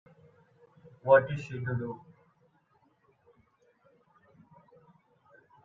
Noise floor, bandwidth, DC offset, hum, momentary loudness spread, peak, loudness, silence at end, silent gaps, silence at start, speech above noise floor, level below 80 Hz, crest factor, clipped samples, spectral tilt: -69 dBFS; 7.2 kHz; under 0.1%; none; 17 LU; -8 dBFS; -28 LUFS; 3.65 s; none; 1.05 s; 42 dB; -70 dBFS; 26 dB; under 0.1%; -8 dB/octave